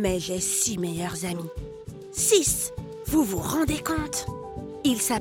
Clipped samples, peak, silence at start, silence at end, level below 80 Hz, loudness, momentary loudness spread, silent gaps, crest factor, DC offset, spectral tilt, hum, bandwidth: under 0.1%; -6 dBFS; 0 s; 0 s; -44 dBFS; -25 LUFS; 16 LU; none; 20 dB; under 0.1%; -3.5 dB/octave; none; 17 kHz